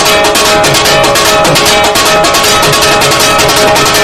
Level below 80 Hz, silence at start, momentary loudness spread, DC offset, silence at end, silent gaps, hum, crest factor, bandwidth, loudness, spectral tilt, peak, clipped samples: -30 dBFS; 0 s; 0 LU; 1%; 0 s; none; none; 6 dB; over 20 kHz; -5 LUFS; -2 dB/octave; 0 dBFS; 1%